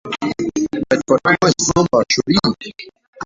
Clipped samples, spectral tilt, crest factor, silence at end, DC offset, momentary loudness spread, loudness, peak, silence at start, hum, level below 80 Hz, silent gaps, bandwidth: under 0.1%; -4 dB/octave; 16 dB; 0 s; under 0.1%; 11 LU; -16 LUFS; -2 dBFS; 0.05 s; none; -46 dBFS; 3.07-3.13 s; 7.8 kHz